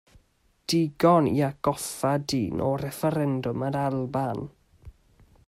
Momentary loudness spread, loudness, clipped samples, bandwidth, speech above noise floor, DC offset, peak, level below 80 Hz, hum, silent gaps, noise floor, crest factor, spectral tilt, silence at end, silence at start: 9 LU; -26 LUFS; under 0.1%; 16 kHz; 40 dB; under 0.1%; -8 dBFS; -56 dBFS; none; none; -65 dBFS; 20 dB; -6 dB/octave; 0.55 s; 0.7 s